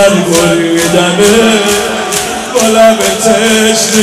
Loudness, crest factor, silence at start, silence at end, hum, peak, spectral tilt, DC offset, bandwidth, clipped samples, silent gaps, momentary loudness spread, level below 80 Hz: -8 LUFS; 8 dB; 0 s; 0 s; none; 0 dBFS; -3 dB/octave; under 0.1%; 16 kHz; 1%; none; 6 LU; -38 dBFS